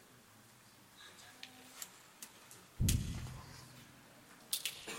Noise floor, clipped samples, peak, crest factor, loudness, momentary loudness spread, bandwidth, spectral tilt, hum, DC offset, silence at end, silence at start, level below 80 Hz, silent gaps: -62 dBFS; under 0.1%; -14 dBFS; 30 dB; -42 LUFS; 24 LU; 16.5 kHz; -3.5 dB/octave; none; under 0.1%; 0 s; 0 s; -52 dBFS; none